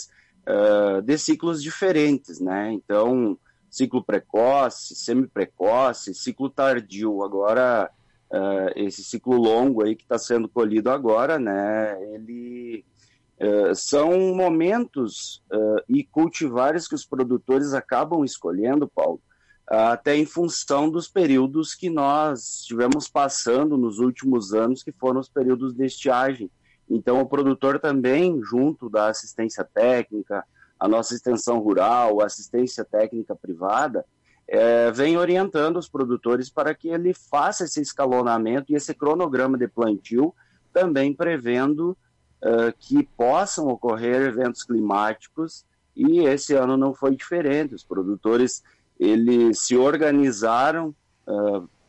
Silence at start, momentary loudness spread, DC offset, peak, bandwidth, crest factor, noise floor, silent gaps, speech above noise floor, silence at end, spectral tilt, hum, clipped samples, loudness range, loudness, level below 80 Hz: 0 s; 9 LU; under 0.1%; -10 dBFS; 9.4 kHz; 12 dB; -61 dBFS; none; 39 dB; 0.2 s; -5 dB/octave; none; under 0.1%; 2 LU; -22 LUFS; -66 dBFS